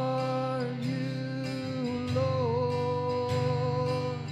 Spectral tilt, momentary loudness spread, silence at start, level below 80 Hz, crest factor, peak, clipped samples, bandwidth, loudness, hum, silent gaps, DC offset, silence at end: -7.5 dB/octave; 5 LU; 0 s; -64 dBFS; 14 dB; -16 dBFS; under 0.1%; 11 kHz; -30 LUFS; none; none; under 0.1%; 0 s